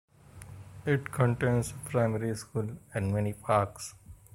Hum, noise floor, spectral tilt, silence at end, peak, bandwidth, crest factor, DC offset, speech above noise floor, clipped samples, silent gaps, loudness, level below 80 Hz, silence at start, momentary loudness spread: none; -49 dBFS; -6.5 dB/octave; 0.2 s; -10 dBFS; 16 kHz; 20 dB; under 0.1%; 19 dB; under 0.1%; none; -31 LUFS; -56 dBFS; 0.35 s; 17 LU